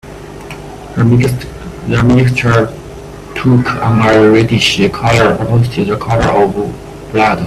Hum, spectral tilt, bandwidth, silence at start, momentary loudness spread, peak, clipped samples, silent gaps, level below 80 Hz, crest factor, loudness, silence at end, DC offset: none; -6.5 dB/octave; 13.5 kHz; 0.05 s; 19 LU; 0 dBFS; under 0.1%; none; -32 dBFS; 12 dB; -11 LUFS; 0 s; under 0.1%